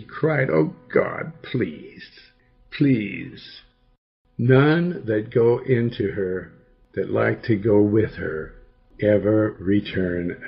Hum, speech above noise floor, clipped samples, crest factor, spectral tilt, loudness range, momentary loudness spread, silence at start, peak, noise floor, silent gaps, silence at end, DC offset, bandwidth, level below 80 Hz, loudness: none; 30 dB; under 0.1%; 18 dB; -11.5 dB/octave; 5 LU; 17 LU; 0 s; -4 dBFS; -51 dBFS; 3.98-4.25 s; 0 s; under 0.1%; 5.8 kHz; -52 dBFS; -22 LUFS